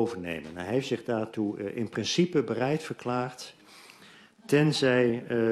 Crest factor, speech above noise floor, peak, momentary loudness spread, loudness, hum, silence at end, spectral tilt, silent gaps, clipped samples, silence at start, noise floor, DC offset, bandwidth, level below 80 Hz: 18 dB; 26 dB; -10 dBFS; 12 LU; -28 LUFS; none; 0 s; -5.5 dB/octave; none; under 0.1%; 0 s; -54 dBFS; under 0.1%; 13 kHz; -66 dBFS